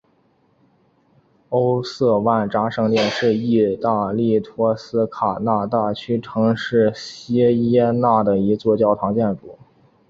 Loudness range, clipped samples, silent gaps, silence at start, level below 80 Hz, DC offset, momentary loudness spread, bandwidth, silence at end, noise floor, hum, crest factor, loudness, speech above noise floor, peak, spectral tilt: 2 LU; under 0.1%; none; 1.5 s; -54 dBFS; under 0.1%; 6 LU; 7.6 kHz; 0.55 s; -60 dBFS; none; 16 dB; -19 LUFS; 42 dB; -4 dBFS; -7.5 dB/octave